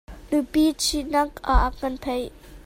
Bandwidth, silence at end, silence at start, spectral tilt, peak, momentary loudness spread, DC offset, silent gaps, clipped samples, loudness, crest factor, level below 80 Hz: 16 kHz; 0 s; 0.1 s; -4 dB/octave; -4 dBFS; 9 LU; under 0.1%; none; under 0.1%; -24 LUFS; 20 dB; -30 dBFS